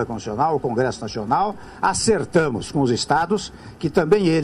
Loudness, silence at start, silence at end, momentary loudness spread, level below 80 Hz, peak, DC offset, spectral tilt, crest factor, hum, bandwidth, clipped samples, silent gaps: -21 LUFS; 0 s; 0 s; 8 LU; -46 dBFS; -6 dBFS; under 0.1%; -5 dB/octave; 16 dB; none; 11.5 kHz; under 0.1%; none